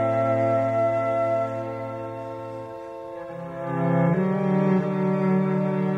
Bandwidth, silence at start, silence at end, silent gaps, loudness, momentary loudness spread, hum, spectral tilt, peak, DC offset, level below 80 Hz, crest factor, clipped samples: 7.2 kHz; 0 s; 0 s; none; -24 LUFS; 14 LU; none; -9.5 dB/octave; -10 dBFS; under 0.1%; -64 dBFS; 12 dB; under 0.1%